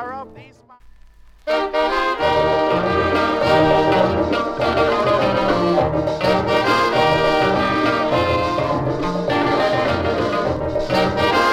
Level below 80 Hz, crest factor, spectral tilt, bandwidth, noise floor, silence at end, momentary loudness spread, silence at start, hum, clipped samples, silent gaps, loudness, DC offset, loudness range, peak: -38 dBFS; 14 dB; -6 dB/octave; 15.5 kHz; -45 dBFS; 0 s; 5 LU; 0 s; none; under 0.1%; none; -18 LUFS; under 0.1%; 2 LU; -4 dBFS